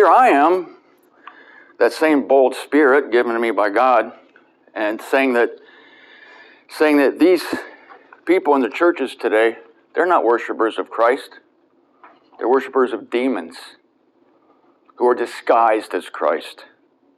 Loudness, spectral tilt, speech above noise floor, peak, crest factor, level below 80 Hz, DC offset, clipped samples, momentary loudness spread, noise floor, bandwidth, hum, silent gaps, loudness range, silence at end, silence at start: -17 LUFS; -4 dB/octave; 42 dB; -2 dBFS; 16 dB; -76 dBFS; under 0.1%; under 0.1%; 13 LU; -59 dBFS; 13 kHz; none; none; 5 LU; 0.55 s; 0 s